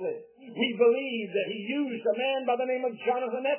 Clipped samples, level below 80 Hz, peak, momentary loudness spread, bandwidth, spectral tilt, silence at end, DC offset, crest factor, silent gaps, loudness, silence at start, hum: under 0.1%; under -90 dBFS; -12 dBFS; 7 LU; 3.2 kHz; -8.5 dB/octave; 0 s; under 0.1%; 18 dB; none; -28 LUFS; 0 s; none